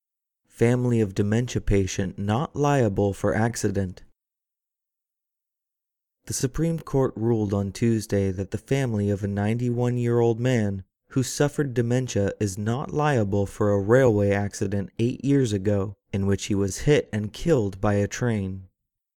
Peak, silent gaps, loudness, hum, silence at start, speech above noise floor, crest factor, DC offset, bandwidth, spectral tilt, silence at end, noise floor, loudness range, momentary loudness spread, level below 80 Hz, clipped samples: -6 dBFS; none; -24 LUFS; none; 0.6 s; 64 dB; 20 dB; under 0.1%; 15.5 kHz; -6.5 dB/octave; 0.55 s; -87 dBFS; 6 LU; 6 LU; -44 dBFS; under 0.1%